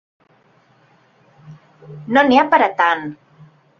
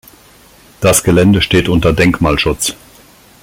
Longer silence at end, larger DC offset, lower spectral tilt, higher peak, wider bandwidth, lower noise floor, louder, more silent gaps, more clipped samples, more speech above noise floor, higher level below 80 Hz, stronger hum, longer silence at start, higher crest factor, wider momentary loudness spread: about the same, 0.65 s vs 0.7 s; neither; about the same, -5.5 dB/octave vs -4.5 dB/octave; about the same, 0 dBFS vs 0 dBFS; second, 7 kHz vs 17 kHz; first, -55 dBFS vs -43 dBFS; second, -15 LUFS vs -11 LUFS; neither; neither; first, 40 dB vs 32 dB; second, -62 dBFS vs -30 dBFS; neither; first, 1.5 s vs 0.8 s; about the same, 18 dB vs 14 dB; first, 17 LU vs 6 LU